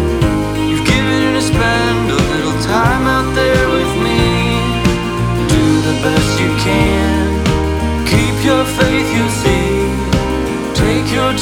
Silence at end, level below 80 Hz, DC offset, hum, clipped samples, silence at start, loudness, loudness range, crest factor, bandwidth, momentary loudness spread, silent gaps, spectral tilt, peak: 0 s; -24 dBFS; under 0.1%; none; under 0.1%; 0 s; -14 LUFS; 1 LU; 12 dB; 18 kHz; 4 LU; none; -5.5 dB/octave; 0 dBFS